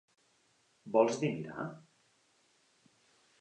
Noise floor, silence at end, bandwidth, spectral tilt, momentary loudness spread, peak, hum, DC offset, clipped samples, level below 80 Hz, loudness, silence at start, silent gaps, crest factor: -72 dBFS; 1.6 s; 9.6 kHz; -6 dB/octave; 25 LU; -14 dBFS; none; under 0.1%; under 0.1%; -80 dBFS; -33 LUFS; 0.85 s; none; 24 dB